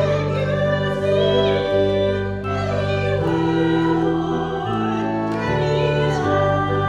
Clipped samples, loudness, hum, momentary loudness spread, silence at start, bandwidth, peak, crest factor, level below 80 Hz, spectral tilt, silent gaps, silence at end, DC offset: under 0.1%; -20 LUFS; none; 4 LU; 0 s; 10 kHz; -6 dBFS; 12 dB; -40 dBFS; -7 dB/octave; none; 0 s; under 0.1%